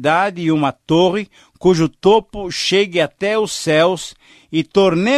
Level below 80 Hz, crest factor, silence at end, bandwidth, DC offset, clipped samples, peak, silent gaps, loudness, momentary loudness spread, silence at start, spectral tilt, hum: -48 dBFS; 14 dB; 0 s; 13 kHz; under 0.1%; under 0.1%; -2 dBFS; none; -16 LUFS; 9 LU; 0 s; -5 dB/octave; none